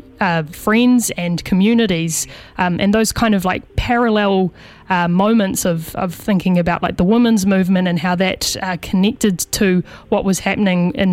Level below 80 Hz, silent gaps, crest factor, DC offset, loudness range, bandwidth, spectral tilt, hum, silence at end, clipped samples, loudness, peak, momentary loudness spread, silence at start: -38 dBFS; none; 16 dB; under 0.1%; 1 LU; 16.5 kHz; -5 dB/octave; none; 0 s; under 0.1%; -16 LUFS; 0 dBFS; 7 LU; 0.2 s